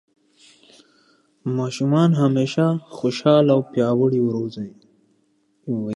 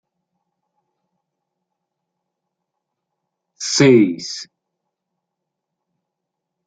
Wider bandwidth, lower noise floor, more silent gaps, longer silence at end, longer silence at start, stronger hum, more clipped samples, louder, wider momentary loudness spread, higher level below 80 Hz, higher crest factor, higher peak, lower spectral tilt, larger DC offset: first, 11.5 kHz vs 9.4 kHz; second, -64 dBFS vs -80 dBFS; neither; second, 0 s vs 2.25 s; second, 1.45 s vs 3.6 s; neither; neither; second, -20 LUFS vs -14 LUFS; second, 14 LU vs 17 LU; about the same, -66 dBFS vs -66 dBFS; about the same, 18 dB vs 22 dB; about the same, -2 dBFS vs -2 dBFS; first, -7.5 dB/octave vs -4.5 dB/octave; neither